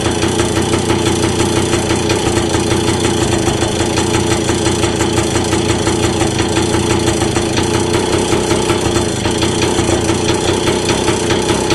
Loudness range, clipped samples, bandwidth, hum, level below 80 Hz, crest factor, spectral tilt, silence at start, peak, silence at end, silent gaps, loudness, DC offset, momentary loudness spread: 0 LU; under 0.1%; 13.5 kHz; none; -28 dBFS; 12 dB; -4.5 dB/octave; 0 s; -2 dBFS; 0 s; none; -14 LUFS; under 0.1%; 1 LU